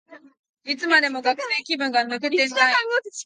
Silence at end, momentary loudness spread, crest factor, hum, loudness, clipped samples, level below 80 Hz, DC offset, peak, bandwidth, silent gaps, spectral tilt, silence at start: 0.05 s; 8 LU; 20 dB; none; -21 LUFS; under 0.1%; -80 dBFS; under 0.1%; -2 dBFS; 10 kHz; 0.39-0.54 s; -1 dB/octave; 0.1 s